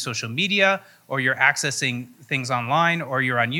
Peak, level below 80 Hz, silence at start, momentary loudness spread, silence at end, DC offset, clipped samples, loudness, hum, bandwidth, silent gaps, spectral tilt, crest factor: -2 dBFS; -74 dBFS; 0 s; 9 LU; 0 s; under 0.1%; under 0.1%; -21 LUFS; none; 18 kHz; none; -3.5 dB/octave; 22 dB